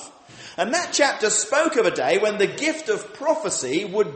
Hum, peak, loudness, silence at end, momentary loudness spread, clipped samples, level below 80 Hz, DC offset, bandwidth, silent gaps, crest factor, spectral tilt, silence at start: none; -6 dBFS; -21 LUFS; 0 s; 8 LU; under 0.1%; -68 dBFS; under 0.1%; 8.8 kHz; none; 18 dB; -2 dB/octave; 0 s